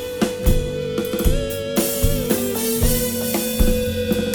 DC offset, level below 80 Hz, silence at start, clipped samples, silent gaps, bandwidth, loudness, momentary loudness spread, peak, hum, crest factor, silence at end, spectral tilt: under 0.1%; -24 dBFS; 0 s; under 0.1%; none; over 20 kHz; -21 LUFS; 4 LU; -4 dBFS; none; 16 dB; 0 s; -4.5 dB/octave